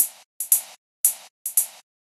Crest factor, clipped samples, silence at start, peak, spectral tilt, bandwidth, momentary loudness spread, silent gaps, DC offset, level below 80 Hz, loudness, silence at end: 26 dB; under 0.1%; 0 s; 0 dBFS; 4.5 dB/octave; 15 kHz; 12 LU; 0.25-0.40 s, 0.78-1.04 s, 1.30-1.45 s; under 0.1%; under -90 dBFS; -22 LUFS; 0.4 s